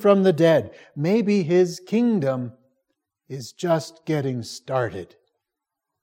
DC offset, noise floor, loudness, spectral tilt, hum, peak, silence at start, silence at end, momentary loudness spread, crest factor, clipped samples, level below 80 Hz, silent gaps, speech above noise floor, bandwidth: under 0.1%; -84 dBFS; -22 LUFS; -7 dB/octave; none; -4 dBFS; 0 s; 0.95 s; 18 LU; 20 dB; under 0.1%; -70 dBFS; none; 63 dB; 16 kHz